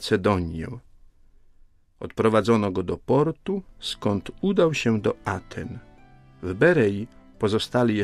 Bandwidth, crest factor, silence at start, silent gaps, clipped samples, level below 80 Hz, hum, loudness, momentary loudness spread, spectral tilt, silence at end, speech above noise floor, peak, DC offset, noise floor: 13.5 kHz; 18 dB; 0 s; none; under 0.1%; -50 dBFS; none; -24 LUFS; 16 LU; -6.5 dB/octave; 0 s; 31 dB; -6 dBFS; under 0.1%; -55 dBFS